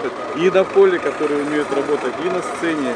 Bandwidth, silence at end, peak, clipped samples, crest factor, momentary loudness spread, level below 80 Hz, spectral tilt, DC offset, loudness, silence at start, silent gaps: 10 kHz; 0 s; -2 dBFS; under 0.1%; 16 dB; 7 LU; -58 dBFS; -5 dB/octave; under 0.1%; -18 LUFS; 0 s; none